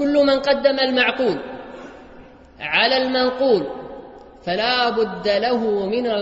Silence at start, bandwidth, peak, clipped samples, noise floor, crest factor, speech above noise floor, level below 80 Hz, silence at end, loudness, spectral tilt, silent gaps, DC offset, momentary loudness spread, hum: 0 s; 8 kHz; -2 dBFS; under 0.1%; -43 dBFS; 18 dB; 25 dB; -52 dBFS; 0 s; -19 LUFS; -5.5 dB/octave; none; under 0.1%; 18 LU; none